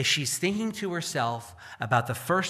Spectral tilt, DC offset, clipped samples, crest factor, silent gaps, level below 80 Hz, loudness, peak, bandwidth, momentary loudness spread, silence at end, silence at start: -3.5 dB/octave; under 0.1%; under 0.1%; 18 dB; none; -64 dBFS; -28 LUFS; -10 dBFS; 15 kHz; 12 LU; 0 s; 0 s